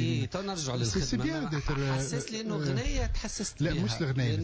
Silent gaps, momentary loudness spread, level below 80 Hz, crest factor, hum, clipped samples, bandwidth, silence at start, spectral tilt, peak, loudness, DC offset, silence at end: none; 4 LU; -40 dBFS; 10 dB; none; under 0.1%; 8 kHz; 0 s; -5 dB/octave; -20 dBFS; -31 LUFS; under 0.1%; 0 s